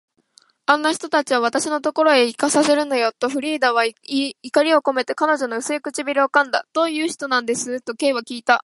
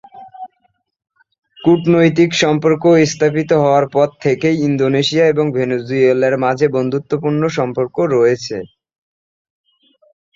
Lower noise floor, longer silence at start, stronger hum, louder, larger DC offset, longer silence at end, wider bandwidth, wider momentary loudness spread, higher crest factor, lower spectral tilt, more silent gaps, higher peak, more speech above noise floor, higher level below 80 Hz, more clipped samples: second, -57 dBFS vs -63 dBFS; first, 0.7 s vs 0.15 s; neither; second, -19 LUFS vs -14 LUFS; neither; second, 0 s vs 1.7 s; first, 11.5 kHz vs 7.6 kHz; about the same, 7 LU vs 7 LU; first, 20 dB vs 14 dB; second, -2 dB/octave vs -6 dB/octave; second, none vs 1.38-1.42 s; about the same, 0 dBFS vs -2 dBFS; second, 37 dB vs 49 dB; second, -74 dBFS vs -56 dBFS; neither